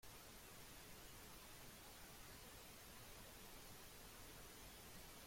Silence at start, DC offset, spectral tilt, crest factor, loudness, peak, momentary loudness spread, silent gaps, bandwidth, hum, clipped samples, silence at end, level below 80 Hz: 0 s; under 0.1%; -2.5 dB/octave; 14 dB; -59 LUFS; -46 dBFS; 0 LU; none; 16.5 kHz; none; under 0.1%; 0 s; -68 dBFS